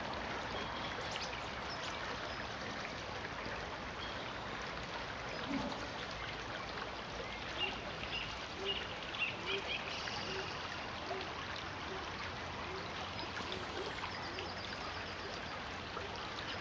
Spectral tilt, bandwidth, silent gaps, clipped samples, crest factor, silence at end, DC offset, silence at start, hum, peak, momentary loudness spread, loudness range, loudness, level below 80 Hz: -3.5 dB/octave; 10 kHz; none; under 0.1%; 18 dB; 0 s; under 0.1%; 0 s; none; -24 dBFS; 4 LU; 3 LU; -41 LUFS; -58 dBFS